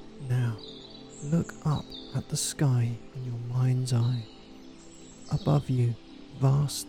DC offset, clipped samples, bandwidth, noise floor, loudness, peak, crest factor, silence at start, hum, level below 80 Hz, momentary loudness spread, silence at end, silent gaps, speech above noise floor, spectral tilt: under 0.1%; under 0.1%; 16 kHz; -48 dBFS; -29 LUFS; -14 dBFS; 16 dB; 0 s; none; -54 dBFS; 21 LU; 0 s; none; 21 dB; -6 dB/octave